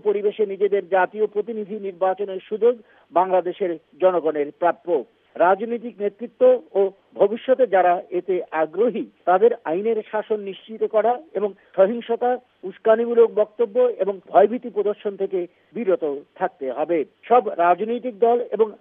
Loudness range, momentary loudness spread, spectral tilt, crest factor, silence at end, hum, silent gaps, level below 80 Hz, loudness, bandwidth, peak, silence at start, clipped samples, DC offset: 3 LU; 10 LU; -9.5 dB/octave; 18 dB; 0.05 s; none; none; -80 dBFS; -21 LUFS; 3.8 kHz; -2 dBFS; 0.05 s; under 0.1%; under 0.1%